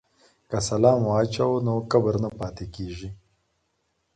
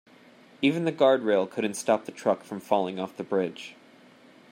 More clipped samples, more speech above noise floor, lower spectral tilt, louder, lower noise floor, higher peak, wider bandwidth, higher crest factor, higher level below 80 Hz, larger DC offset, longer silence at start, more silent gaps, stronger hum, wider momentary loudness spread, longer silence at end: neither; first, 50 dB vs 28 dB; first, -6.5 dB/octave vs -5 dB/octave; first, -24 LUFS vs -27 LUFS; first, -73 dBFS vs -54 dBFS; about the same, -6 dBFS vs -8 dBFS; second, 9.4 kHz vs 16 kHz; about the same, 20 dB vs 20 dB; first, -48 dBFS vs -78 dBFS; neither; about the same, 0.5 s vs 0.6 s; neither; neither; first, 15 LU vs 11 LU; first, 1 s vs 0.8 s